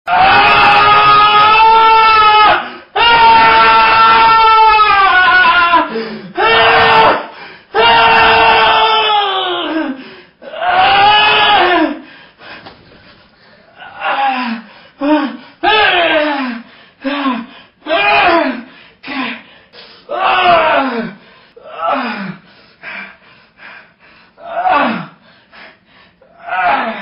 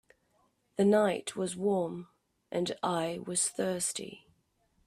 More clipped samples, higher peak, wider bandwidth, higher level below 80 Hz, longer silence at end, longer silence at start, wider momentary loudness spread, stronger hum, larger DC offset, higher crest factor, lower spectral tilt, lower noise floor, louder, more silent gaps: neither; first, 0 dBFS vs -16 dBFS; second, 5.6 kHz vs 14.5 kHz; first, -42 dBFS vs -72 dBFS; second, 0 s vs 0.7 s; second, 0.05 s vs 0.8 s; first, 17 LU vs 13 LU; neither; neither; second, 12 dB vs 18 dB; first, -5.5 dB/octave vs -4 dB/octave; second, -46 dBFS vs -72 dBFS; first, -9 LUFS vs -31 LUFS; neither